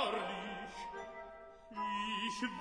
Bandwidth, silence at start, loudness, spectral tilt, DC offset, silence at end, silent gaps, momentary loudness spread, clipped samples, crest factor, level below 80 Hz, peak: 10.5 kHz; 0 s; -41 LUFS; -3.5 dB/octave; under 0.1%; 0 s; none; 13 LU; under 0.1%; 20 dB; -66 dBFS; -22 dBFS